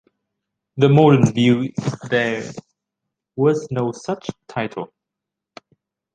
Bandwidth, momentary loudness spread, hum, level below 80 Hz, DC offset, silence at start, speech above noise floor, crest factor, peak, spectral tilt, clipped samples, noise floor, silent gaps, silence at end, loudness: 9.2 kHz; 21 LU; none; -58 dBFS; under 0.1%; 0.75 s; 66 dB; 18 dB; -2 dBFS; -7 dB/octave; under 0.1%; -84 dBFS; none; 1.3 s; -19 LUFS